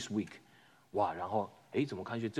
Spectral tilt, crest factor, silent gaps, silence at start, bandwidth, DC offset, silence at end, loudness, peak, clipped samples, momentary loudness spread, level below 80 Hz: -6 dB/octave; 20 dB; none; 0 s; 13.5 kHz; under 0.1%; 0 s; -37 LUFS; -18 dBFS; under 0.1%; 8 LU; -78 dBFS